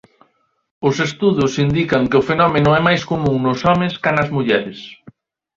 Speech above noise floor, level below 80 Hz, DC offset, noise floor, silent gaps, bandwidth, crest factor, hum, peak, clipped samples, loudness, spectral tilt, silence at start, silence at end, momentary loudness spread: 45 dB; -44 dBFS; under 0.1%; -61 dBFS; none; 7.6 kHz; 16 dB; none; 0 dBFS; under 0.1%; -16 LUFS; -6.5 dB/octave; 0.8 s; 0.45 s; 6 LU